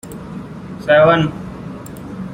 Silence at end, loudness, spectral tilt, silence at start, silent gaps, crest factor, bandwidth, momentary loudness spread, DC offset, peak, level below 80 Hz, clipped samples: 0 s; -14 LUFS; -6.5 dB/octave; 0.05 s; none; 16 dB; 16 kHz; 20 LU; under 0.1%; -2 dBFS; -44 dBFS; under 0.1%